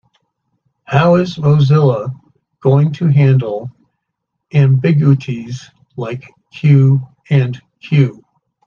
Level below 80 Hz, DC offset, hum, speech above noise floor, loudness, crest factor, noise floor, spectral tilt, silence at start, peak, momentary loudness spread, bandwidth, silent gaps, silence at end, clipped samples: -54 dBFS; under 0.1%; none; 63 dB; -13 LUFS; 14 dB; -75 dBFS; -9 dB/octave; 0.9 s; 0 dBFS; 16 LU; 6.8 kHz; none; 0.55 s; under 0.1%